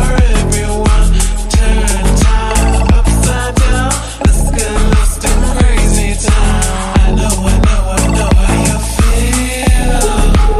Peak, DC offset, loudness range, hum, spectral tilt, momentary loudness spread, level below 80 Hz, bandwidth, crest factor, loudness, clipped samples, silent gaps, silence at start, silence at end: 0 dBFS; under 0.1%; 1 LU; none; -4.5 dB/octave; 3 LU; -10 dBFS; 13 kHz; 10 dB; -12 LUFS; under 0.1%; none; 0 s; 0 s